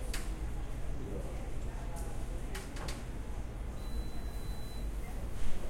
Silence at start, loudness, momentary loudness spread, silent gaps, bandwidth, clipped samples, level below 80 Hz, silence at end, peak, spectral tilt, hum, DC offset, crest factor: 0 s; -43 LUFS; 2 LU; none; 15.5 kHz; under 0.1%; -40 dBFS; 0 s; -18 dBFS; -5 dB/octave; none; under 0.1%; 16 dB